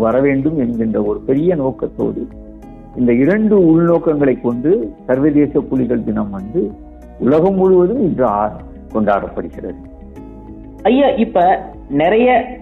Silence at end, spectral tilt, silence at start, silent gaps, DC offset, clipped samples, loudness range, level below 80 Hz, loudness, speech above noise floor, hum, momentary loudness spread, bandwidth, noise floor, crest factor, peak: 0 s; -10 dB/octave; 0 s; none; under 0.1%; under 0.1%; 3 LU; -38 dBFS; -15 LUFS; 19 dB; none; 16 LU; 4.1 kHz; -33 dBFS; 12 dB; -2 dBFS